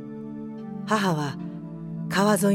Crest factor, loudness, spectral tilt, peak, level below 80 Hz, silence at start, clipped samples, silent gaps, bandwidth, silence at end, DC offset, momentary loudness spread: 18 dB; -27 LUFS; -5.5 dB/octave; -8 dBFS; -62 dBFS; 0 s; under 0.1%; none; 16.5 kHz; 0 s; under 0.1%; 14 LU